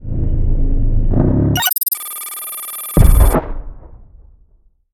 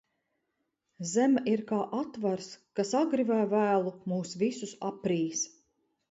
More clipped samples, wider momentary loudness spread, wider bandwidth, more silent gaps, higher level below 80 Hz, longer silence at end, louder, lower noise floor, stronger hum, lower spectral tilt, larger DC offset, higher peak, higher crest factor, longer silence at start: neither; about the same, 11 LU vs 11 LU; first, 19.5 kHz vs 8 kHz; neither; first, -16 dBFS vs -76 dBFS; first, 0.9 s vs 0.65 s; first, -17 LUFS vs -30 LUFS; second, -52 dBFS vs -81 dBFS; neither; about the same, -5 dB/octave vs -5 dB/octave; neither; first, 0 dBFS vs -14 dBFS; about the same, 14 dB vs 16 dB; second, 0 s vs 1 s